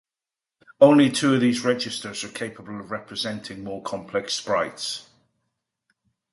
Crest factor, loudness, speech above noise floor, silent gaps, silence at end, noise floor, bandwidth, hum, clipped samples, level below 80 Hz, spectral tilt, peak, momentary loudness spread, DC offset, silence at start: 22 dB; -23 LUFS; 67 dB; none; 1.3 s; -90 dBFS; 11.5 kHz; none; under 0.1%; -64 dBFS; -4.5 dB/octave; -2 dBFS; 17 LU; under 0.1%; 0.8 s